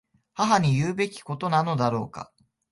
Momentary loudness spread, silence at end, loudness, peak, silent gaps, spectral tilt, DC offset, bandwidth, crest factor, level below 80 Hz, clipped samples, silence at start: 19 LU; 0.5 s; -25 LUFS; -6 dBFS; none; -6 dB/octave; under 0.1%; 11.5 kHz; 18 dB; -58 dBFS; under 0.1%; 0.35 s